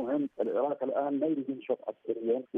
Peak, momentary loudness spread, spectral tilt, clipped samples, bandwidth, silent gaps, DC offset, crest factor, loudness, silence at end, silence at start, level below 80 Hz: -18 dBFS; 5 LU; -9.5 dB/octave; under 0.1%; 3.7 kHz; none; under 0.1%; 14 dB; -32 LUFS; 0 s; 0 s; -86 dBFS